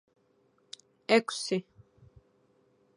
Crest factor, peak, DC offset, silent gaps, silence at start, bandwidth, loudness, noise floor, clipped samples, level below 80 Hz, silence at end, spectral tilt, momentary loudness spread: 26 dB; -8 dBFS; under 0.1%; none; 1.1 s; 11.5 kHz; -29 LUFS; -69 dBFS; under 0.1%; -72 dBFS; 1.35 s; -4 dB/octave; 23 LU